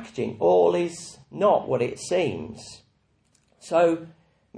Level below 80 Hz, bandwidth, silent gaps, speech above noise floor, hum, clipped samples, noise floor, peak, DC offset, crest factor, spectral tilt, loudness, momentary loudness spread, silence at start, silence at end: -62 dBFS; 10.5 kHz; none; 42 dB; none; under 0.1%; -66 dBFS; -8 dBFS; under 0.1%; 18 dB; -5.5 dB/octave; -23 LUFS; 19 LU; 0 s; 0 s